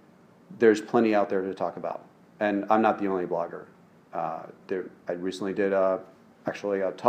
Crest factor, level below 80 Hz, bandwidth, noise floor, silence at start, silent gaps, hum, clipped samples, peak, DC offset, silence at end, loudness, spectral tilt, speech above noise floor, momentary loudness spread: 22 dB; -76 dBFS; 9.8 kHz; -56 dBFS; 0.5 s; none; none; under 0.1%; -6 dBFS; under 0.1%; 0 s; -27 LUFS; -6.5 dB/octave; 29 dB; 13 LU